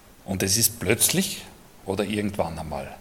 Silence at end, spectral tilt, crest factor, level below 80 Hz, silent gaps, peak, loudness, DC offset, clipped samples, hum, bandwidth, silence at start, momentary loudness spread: 0 s; -3 dB/octave; 24 dB; -52 dBFS; none; -2 dBFS; -24 LUFS; under 0.1%; under 0.1%; none; 17.5 kHz; 0.2 s; 14 LU